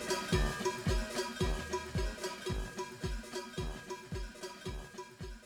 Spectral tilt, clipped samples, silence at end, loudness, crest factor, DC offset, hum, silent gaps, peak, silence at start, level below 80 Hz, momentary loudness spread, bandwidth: -4.5 dB/octave; under 0.1%; 0 s; -39 LUFS; 18 dB; under 0.1%; none; none; -18 dBFS; 0 s; -42 dBFS; 12 LU; 20 kHz